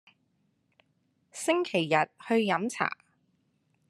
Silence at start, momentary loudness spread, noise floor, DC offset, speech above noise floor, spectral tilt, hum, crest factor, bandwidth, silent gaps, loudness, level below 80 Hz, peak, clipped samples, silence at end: 1.35 s; 9 LU; -73 dBFS; under 0.1%; 45 dB; -4.5 dB/octave; none; 24 dB; 13 kHz; none; -28 LUFS; -80 dBFS; -8 dBFS; under 0.1%; 0.95 s